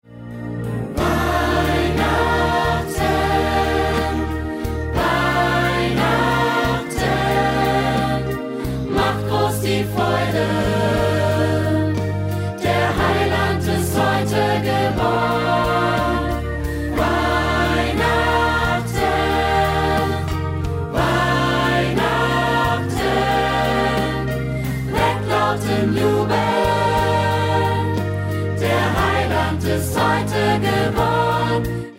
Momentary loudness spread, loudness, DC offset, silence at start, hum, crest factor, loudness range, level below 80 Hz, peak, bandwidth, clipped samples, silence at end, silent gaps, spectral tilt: 5 LU; -19 LUFS; under 0.1%; 0.1 s; none; 12 dB; 1 LU; -32 dBFS; -6 dBFS; 16 kHz; under 0.1%; 0 s; none; -5.5 dB/octave